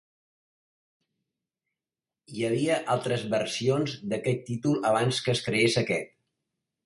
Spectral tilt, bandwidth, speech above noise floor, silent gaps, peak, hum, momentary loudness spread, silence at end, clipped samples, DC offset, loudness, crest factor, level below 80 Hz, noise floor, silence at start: -5 dB/octave; 11.5 kHz; over 63 dB; none; -10 dBFS; none; 7 LU; 0.8 s; under 0.1%; under 0.1%; -27 LUFS; 20 dB; -66 dBFS; under -90 dBFS; 2.3 s